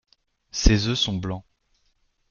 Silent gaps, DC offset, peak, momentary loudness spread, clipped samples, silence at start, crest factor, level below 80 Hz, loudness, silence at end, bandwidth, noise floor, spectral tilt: none; under 0.1%; -2 dBFS; 13 LU; under 0.1%; 0.55 s; 24 dB; -30 dBFS; -23 LUFS; 0.9 s; 7.2 kHz; -68 dBFS; -4.5 dB/octave